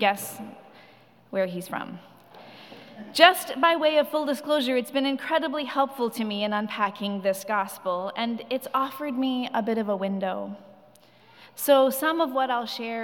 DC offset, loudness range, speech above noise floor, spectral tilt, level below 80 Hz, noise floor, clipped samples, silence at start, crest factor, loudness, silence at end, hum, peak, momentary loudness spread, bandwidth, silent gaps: under 0.1%; 6 LU; 30 dB; -3.5 dB/octave; under -90 dBFS; -55 dBFS; under 0.1%; 0 s; 24 dB; -25 LUFS; 0 s; none; -2 dBFS; 18 LU; 18 kHz; none